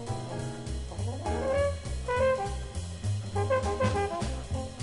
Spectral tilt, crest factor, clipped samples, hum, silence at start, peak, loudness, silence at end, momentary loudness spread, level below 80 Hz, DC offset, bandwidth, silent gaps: -6 dB/octave; 14 dB; under 0.1%; none; 0 s; -16 dBFS; -31 LUFS; 0 s; 9 LU; -40 dBFS; under 0.1%; 11.5 kHz; none